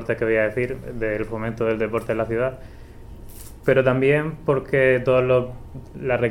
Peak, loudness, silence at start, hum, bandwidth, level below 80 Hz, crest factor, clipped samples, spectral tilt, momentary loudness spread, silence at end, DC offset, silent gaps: -4 dBFS; -22 LUFS; 0 s; none; 16.5 kHz; -42 dBFS; 18 dB; under 0.1%; -7.5 dB/octave; 18 LU; 0 s; under 0.1%; none